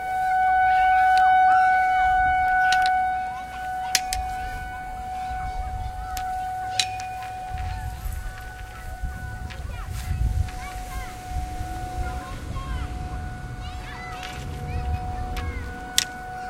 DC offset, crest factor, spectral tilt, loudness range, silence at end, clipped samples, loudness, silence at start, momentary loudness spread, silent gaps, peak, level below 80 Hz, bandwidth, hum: under 0.1%; 24 dB; -3 dB/octave; 14 LU; 0 s; under 0.1%; -25 LUFS; 0 s; 17 LU; none; 0 dBFS; -34 dBFS; 16 kHz; none